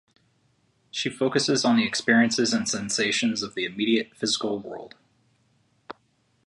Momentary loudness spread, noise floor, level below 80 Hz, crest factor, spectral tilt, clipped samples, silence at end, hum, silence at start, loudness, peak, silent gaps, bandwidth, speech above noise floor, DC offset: 19 LU; -67 dBFS; -68 dBFS; 20 dB; -3 dB/octave; under 0.1%; 0.55 s; none; 0.95 s; -24 LUFS; -6 dBFS; none; 11.5 kHz; 43 dB; under 0.1%